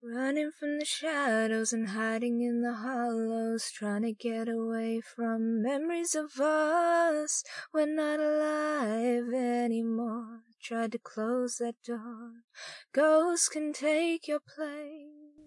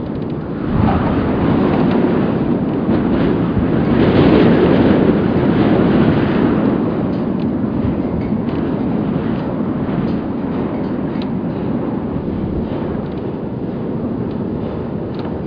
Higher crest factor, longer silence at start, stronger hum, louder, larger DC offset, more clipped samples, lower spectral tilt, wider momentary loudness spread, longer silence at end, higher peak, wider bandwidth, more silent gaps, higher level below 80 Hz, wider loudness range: about the same, 16 dB vs 16 dB; about the same, 0.05 s vs 0 s; neither; second, -31 LUFS vs -16 LUFS; neither; neither; second, -3.5 dB/octave vs -10.5 dB/octave; first, 13 LU vs 10 LU; about the same, 0.05 s vs 0 s; second, -14 dBFS vs 0 dBFS; first, 11.5 kHz vs 5.4 kHz; first, 12.44-12.48 s vs none; second, under -90 dBFS vs -34 dBFS; second, 4 LU vs 8 LU